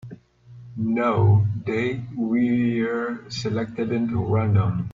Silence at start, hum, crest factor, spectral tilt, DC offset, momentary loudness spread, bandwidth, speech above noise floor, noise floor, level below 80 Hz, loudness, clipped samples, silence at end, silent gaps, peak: 0.05 s; 60 Hz at -40 dBFS; 14 dB; -8 dB/octave; under 0.1%; 10 LU; 7.4 kHz; 25 dB; -46 dBFS; -52 dBFS; -23 LUFS; under 0.1%; 0 s; none; -8 dBFS